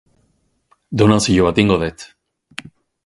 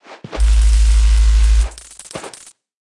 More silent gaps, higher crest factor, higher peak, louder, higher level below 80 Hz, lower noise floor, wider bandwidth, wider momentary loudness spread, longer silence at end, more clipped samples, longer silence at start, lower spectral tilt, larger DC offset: neither; first, 18 dB vs 10 dB; first, 0 dBFS vs -4 dBFS; about the same, -15 LUFS vs -15 LUFS; second, -40 dBFS vs -14 dBFS; first, -63 dBFS vs -42 dBFS; about the same, 11.5 kHz vs 11 kHz; first, 21 LU vs 17 LU; first, 1 s vs 0.7 s; neither; first, 0.9 s vs 0.1 s; about the same, -5.5 dB/octave vs -4.5 dB/octave; neither